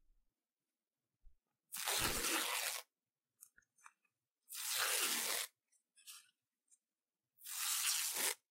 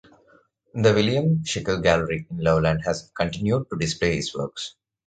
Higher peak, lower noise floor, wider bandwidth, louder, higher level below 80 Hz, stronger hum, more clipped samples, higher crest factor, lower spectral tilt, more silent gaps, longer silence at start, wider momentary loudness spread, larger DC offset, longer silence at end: second, -20 dBFS vs -4 dBFS; first, under -90 dBFS vs -59 dBFS; first, 16 kHz vs 9.2 kHz; second, -38 LUFS vs -23 LUFS; second, -66 dBFS vs -44 dBFS; neither; neither; about the same, 24 dB vs 20 dB; second, 0.5 dB/octave vs -5.5 dB/octave; neither; first, 1.25 s vs 0.75 s; first, 20 LU vs 10 LU; neither; second, 0.15 s vs 0.35 s